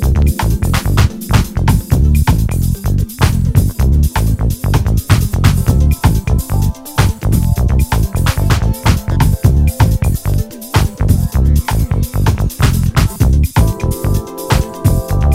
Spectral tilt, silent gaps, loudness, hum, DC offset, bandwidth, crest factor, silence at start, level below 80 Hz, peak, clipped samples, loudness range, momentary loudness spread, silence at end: -6 dB/octave; none; -14 LUFS; none; under 0.1%; 16.5 kHz; 12 dB; 0 s; -16 dBFS; 0 dBFS; 0.3%; 1 LU; 4 LU; 0 s